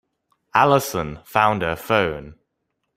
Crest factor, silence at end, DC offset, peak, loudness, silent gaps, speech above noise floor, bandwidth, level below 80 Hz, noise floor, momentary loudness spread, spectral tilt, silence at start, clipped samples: 22 dB; 0.65 s; under 0.1%; 0 dBFS; -20 LUFS; none; 56 dB; 16 kHz; -50 dBFS; -76 dBFS; 10 LU; -5 dB/octave; 0.55 s; under 0.1%